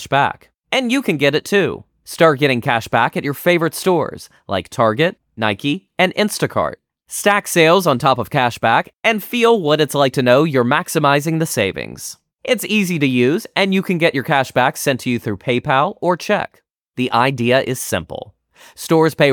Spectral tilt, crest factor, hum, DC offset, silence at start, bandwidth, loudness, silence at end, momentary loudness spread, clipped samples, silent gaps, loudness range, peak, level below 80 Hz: -4.5 dB/octave; 16 dB; none; under 0.1%; 0 s; 19.5 kHz; -16 LUFS; 0 s; 10 LU; under 0.1%; 16.81-16.85 s; 3 LU; 0 dBFS; -56 dBFS